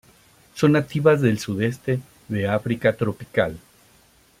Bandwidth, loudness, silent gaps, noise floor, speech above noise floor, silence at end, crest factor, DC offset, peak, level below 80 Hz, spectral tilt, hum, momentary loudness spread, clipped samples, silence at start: 16 kHz; -22 LUFS; none; -56 dBFS; 35 dB; 0.8 s; 20 dB; under 0.1%; -4 dBFS; -56 dBFS; -7 dB/octave; none; 9 LU; under 0.1%; 0.55 s